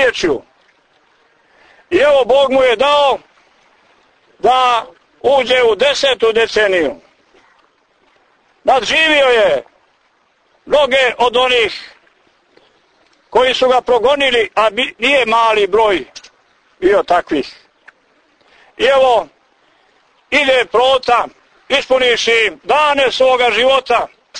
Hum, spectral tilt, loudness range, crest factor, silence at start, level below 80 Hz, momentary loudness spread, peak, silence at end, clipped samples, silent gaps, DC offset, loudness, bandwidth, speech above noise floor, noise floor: none; -2.5 dB/octave; 4 LU; 14 dB; 0 s; -48 dBFS; 8 LU; -2 dBFS; 0 s; under 0.1%; none; under 0.1%; -12 LUFS; 9.6 kHz; 45 dB; -57 dBFS